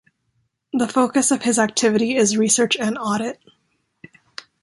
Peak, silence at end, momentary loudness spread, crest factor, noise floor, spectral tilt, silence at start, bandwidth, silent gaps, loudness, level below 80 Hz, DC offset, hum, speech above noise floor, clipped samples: -4 dBFS; 1.3 s; 20 LU; 16 dB; -69 dBFS; -3 dB/octave; 0.75 s; 11.5 kHz; none; -19 LUFS; -64 dBFS; under 0.1%; none; 51 dB; under 0.1%